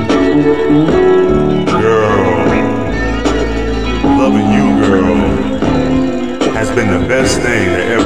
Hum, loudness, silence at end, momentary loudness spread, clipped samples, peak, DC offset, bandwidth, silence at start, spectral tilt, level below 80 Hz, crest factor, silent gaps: none; -12 LUFS; 0 s; 5 LU; under 0.1%; 0 dBFS; 4%; 12 kHz; 0 s; -6 dB/octave; -26 dBFS; 12 dB; none